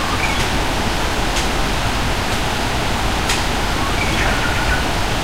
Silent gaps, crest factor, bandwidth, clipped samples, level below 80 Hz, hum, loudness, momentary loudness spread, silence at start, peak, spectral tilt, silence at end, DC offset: none; 14 dB; 16 kHz; under 0.1%; -24 dBFS; none; -18 LUFS; 2 LU; 0 s; -4 dBFS; -3.5 dB/octave; 0 s; 4%